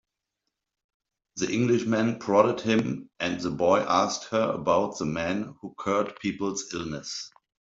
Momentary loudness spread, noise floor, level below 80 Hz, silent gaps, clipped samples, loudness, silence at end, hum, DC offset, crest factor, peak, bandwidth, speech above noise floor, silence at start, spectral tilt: 11 LU; -83 dBFS; -62 dBFS; none; under 0.1%; -27 LUFS; 0.5 s; none; under 0.1%; 22 dB; -6 dBFS; 7.8 kHz; 57 dB; 1.35 s; -5 dB/octave